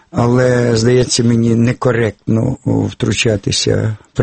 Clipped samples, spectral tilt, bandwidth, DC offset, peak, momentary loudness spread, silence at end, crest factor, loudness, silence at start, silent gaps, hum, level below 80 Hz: under 0.1%; -5.5 dB/octave; 8.8 kHz; under 0.1%; 0 dBFS; 5 LU; 0 s; 14 dB; -14 LUFS; 0.15 s; none; none; -38 dBFS